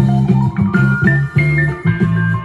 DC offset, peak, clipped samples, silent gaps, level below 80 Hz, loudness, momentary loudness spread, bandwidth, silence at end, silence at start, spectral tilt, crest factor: under 0.1%; 0 dBFS; under 0.1%; none; -36 dBFS; -14 LUFS; 2 LU; 7.4 kHz; 0 s; 0 s; -9 dB/octave; 12 dB